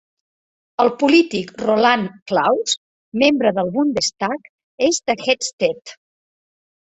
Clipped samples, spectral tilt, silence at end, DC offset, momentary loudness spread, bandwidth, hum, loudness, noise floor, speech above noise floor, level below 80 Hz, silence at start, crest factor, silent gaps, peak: under 0.1%; -3.5 dB/octave; 0.9 s; under 0.1%; 9 LU; 8.2 kHz; none; -18 LUFS; under -90 dBFS; over 72 dB; -60 dBFS; 0.8 s; 18 dB; 2.22-2.26 s, 2.77-3.12 s, 4.49-4.58 s, 4.64-4.78 s, 5.53-5.58 s; -2 dBFS